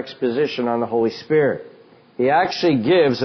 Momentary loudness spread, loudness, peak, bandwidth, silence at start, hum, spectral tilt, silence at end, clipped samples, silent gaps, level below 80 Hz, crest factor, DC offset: 7 LU; -19 LUFS; -4 dBFS; 6.4 kHz; 0 s; none; -4 dB/octave; 0 s; under 0.1%; none; -60 dBFS; 14 dB; under 0.1%